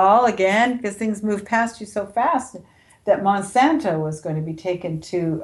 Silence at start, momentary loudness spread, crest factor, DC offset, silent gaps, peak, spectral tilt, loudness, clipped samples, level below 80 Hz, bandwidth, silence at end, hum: 0 s; 9 LU; 16 dB; under 0.1%; none; -6 dBFS; -5.5 dB/octave; -21 LUFS; under 0.1%; -58 dBFS; 12 kHz; 0 s; none